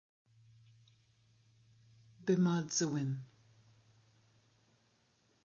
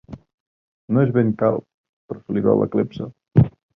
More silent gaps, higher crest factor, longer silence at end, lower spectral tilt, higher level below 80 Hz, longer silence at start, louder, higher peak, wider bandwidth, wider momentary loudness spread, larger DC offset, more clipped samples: second, none vs 0.34-0.88 s, 1.74-2.09 s; about the same, 20 dB vs 20 dB; first, 2.2 s vs 0.3 s; second, -6.5 dB/octave vs -11.5 dB/octave; second, -82 dBFS vs -46 dBFS; first, 2.2 s vs 0.1 s; second, -35 LUFS vs -20 LUFS; second, -20 dBFS vs -2 dBFS; first, 7.2 kHz vs 5.4 kHz; about the same, 13 LU vs 13 LU; neither; neither